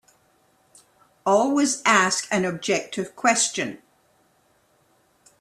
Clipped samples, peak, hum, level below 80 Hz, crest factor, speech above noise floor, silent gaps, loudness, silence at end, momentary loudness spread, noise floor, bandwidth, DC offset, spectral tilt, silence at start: under 0.1%; -4 dBFS; none; -68 dBFS; 22 dB; 41 dB; none; -22 LUFS; 1.65 s; 11 LU; -63 dBFS; 13.5 kHz; under 0.1%; -2.5 dB/octave; 1.25 s